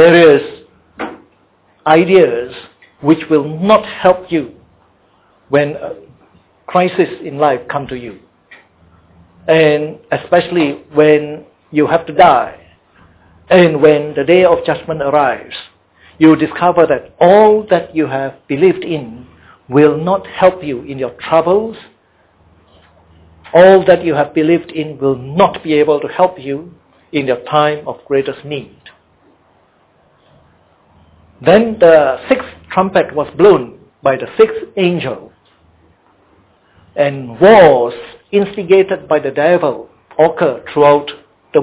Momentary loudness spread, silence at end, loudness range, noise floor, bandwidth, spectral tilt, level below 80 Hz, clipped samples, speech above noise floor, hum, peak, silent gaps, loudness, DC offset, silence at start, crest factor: 16 LU; 0 s; 7 LU; -53 dBFS; 4 kHz; -10 dB/octave; -48 dBFS; 0.2%; 42 dB; none; 0 dBFS; none; -12 LUFS; under 0.1%; 0 s; 14 dB